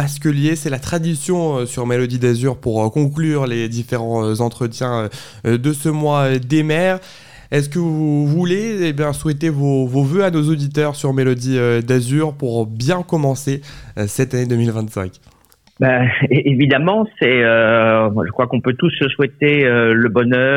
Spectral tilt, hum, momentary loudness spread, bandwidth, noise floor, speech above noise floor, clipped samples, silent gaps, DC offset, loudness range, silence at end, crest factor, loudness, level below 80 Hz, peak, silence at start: -6 dB/octave; none; 8 LU; 16 kHz; -49 dBFS; 33 dB; under 0.1%; none; 0.5%; 5 LU; 0 s; 14 dB; -17 LUFS; -48 dBFS; -2 dBFS; 0 s